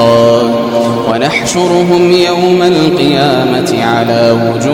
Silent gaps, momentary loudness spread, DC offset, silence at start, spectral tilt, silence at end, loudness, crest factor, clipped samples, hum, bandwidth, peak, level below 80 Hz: none; 4 LU; under 0.1%; 0 s; -5.5 dB/octave; 0 s; -9 LUFS; 8 dB; under 0.1%; none; 17 kHz; 0 dBFS; -44 dBFS